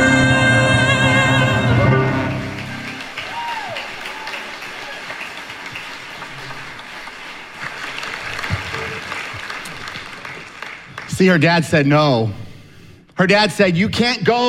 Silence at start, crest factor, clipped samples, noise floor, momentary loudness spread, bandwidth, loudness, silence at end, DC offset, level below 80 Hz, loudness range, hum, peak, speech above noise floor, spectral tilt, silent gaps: 0 s; 18 dB; under 0.1%; -43 dBFS; 18 LU; 14.5 kHz; -17 LUFS; 0 s; under 0.1%; -42 dBFS; 13 LU; none; -2 dBFS; 28 dB; -5.5 dB/octave; none